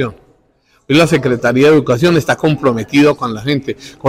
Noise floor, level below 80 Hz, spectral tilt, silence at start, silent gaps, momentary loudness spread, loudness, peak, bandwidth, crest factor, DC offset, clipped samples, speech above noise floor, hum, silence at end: -55 dBFS; -46 dBFS; -6 dB/octave; 0 s; none; 9 LU; -12 LUFS; -2 dBFS; 15.5 kHz; 12 dB; under 0.1%; under 0.1%; 43 dB; none; 0 s